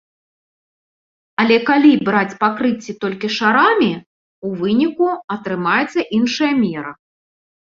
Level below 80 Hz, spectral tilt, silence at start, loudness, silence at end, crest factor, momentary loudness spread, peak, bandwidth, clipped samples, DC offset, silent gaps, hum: -60 dBFS; -5.5 dB/octave; 1.4 s; -16 LUFS; 0.8 s; 16 dB; 13 LU; -2 dBFS; 7.6 kHz; under 0.1%; under 0.1%; 4.06-4.42 s, 5.24-5.28 s; none